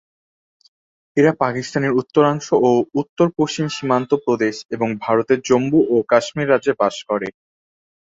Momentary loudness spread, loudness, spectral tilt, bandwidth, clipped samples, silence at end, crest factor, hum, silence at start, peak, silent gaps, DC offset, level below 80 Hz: 8 LU; -18 LUFS; -6 dB/octave; 7.8 kHz; under 0.1%; 0.7 s; 18 dB; none; 1.15 s; -2 dBFS; 3.09-3.16 s, 4.65-4.69 s; under 0.1%; -60 dBFS